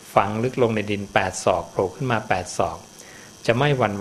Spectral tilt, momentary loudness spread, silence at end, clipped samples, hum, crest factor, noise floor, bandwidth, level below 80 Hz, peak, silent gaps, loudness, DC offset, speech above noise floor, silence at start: -5 dB/octave; 12 LU; 0 s; under 0.1%; none; 22 dB; -43 dBFS; 13.5 kHz; -52 dBFS; 0 dBFS; none; -23 LUFS; under 0.1%; 21 dB; 0 s